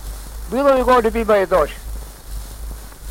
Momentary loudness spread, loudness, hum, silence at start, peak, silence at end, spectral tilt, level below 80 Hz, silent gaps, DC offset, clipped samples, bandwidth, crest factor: 20 LU; -16 LUFS; none; 0 s; -4 dBFS; 0 s; -5.5 dB/octave; -32 dBFS; none; under 0.1%; under 0.1%; 16.5 kHz; 14 dB